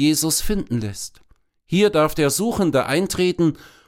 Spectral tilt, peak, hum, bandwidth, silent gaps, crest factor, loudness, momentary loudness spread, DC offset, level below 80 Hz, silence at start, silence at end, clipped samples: -4.5 dB/octave; -4 dBFS; none; 17 kHz; none; 16 dB; -20 LUFS; 9 LU; under 0.1%; -38 dBFS; 0 s; 0.2 s; under 0.1%